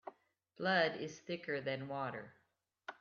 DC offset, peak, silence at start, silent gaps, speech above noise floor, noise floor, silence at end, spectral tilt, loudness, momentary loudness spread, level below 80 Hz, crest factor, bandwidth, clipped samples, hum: under 0.1%; -20 dBFS; 0.05 s; none; 32 dB; -70 dBFS; 0.05 s; -2.5 dB/octave; -38 LUFS; 20 LU; -84 dBFS; 22 dB; 7.4 kHz; under 0.1%; none